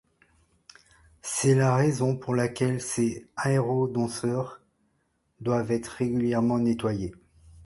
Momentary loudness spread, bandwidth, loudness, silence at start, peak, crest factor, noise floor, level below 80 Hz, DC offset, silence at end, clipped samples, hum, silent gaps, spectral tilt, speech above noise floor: 9 LU; 11.5 kHz; -26 LUFS; 1.25 s; -10 dBFS; 18 dB; -72 dBFS; -58 dBFS; under 0.1%; 0 s; under 0.1%; none; none; -6 dB/octave; 47 dB